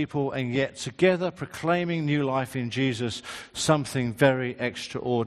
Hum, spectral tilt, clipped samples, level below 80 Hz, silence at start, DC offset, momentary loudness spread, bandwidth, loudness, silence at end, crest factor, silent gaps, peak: none; -5.5 dB/octave; under 0.1%; -60 dBFS; 0 s; under 0.1%; 9 LU; 13 kHz; -26 LUFS; 0 s; 20 dB; none; -6 dBFS